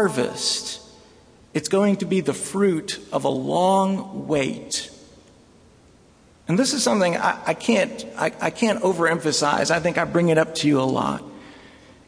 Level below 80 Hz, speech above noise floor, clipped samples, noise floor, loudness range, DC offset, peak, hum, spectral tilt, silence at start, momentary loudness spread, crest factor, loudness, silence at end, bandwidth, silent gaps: -58 dBFS; 32 dB; under 0.1%; -53 dBFS; 4 LU; under 0.1%; -4 dBFS; none; -4.5 dB/octave; 0 s; 9 LU; 18 dB; -22 LUFS; 0.45 s; 11 kHz; none